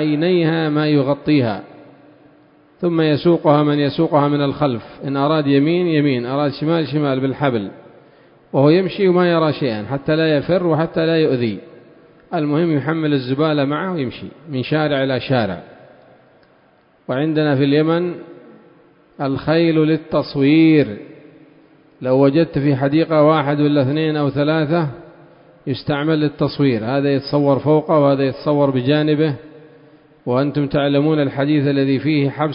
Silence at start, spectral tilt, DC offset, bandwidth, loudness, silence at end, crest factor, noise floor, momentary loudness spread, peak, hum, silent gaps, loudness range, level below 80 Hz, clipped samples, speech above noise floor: 0 s; -12.5 dB/octave; under 0.1%; 5.4 kHz; -17 LUFS; 0 s; 16 dB; -54 dBFS; 10 LU; 0 dBFS; none; none; 4 LU; -54 dBFS; under 0.1%; 38 dB